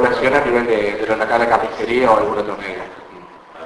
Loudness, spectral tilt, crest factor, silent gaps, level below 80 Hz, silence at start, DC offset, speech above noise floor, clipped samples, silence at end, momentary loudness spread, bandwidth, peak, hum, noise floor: -17 LUFS; -5.5 dB/octave; 16 dB; none; -46 dBFS; 0 s; under 0.1%; 22 dB; under 0.1%; 0 s; 13 LU; 11 kHz; 0 dBFS; none; -39 dBFS